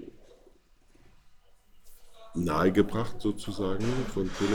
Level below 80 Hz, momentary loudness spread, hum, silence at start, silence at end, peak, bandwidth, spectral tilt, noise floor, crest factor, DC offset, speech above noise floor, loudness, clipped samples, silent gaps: -46 dBFS; 9 LU; none; 0 s; 0 s; -10 dBFS; 18.5 kHz; -6.5 dB/octave; -59 dBFS; 20 dB; under 0.1%; 32 dB; -30 LUFS; under 0.1%; none